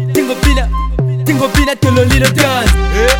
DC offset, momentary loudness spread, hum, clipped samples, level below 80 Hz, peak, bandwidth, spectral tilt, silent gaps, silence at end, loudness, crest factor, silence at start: under 0.1%; 6 LU; none; 0.3%; -16 dBFS; 0 dBFS; 18 kHz; -5 dB/octave; none; 0 s; -12 LUFS; 10 dB; 0 s